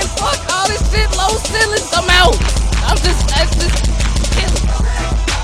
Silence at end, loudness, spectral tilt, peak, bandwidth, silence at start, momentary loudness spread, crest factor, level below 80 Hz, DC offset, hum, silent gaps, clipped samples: 0 s; -14 LUFS; -3.5 dB/octave; 0 dBFS; 13.5 kHz; 0 s; 6 LU; 14 dB; -16 dBFS; under 0.1%; none; none; under 0.1%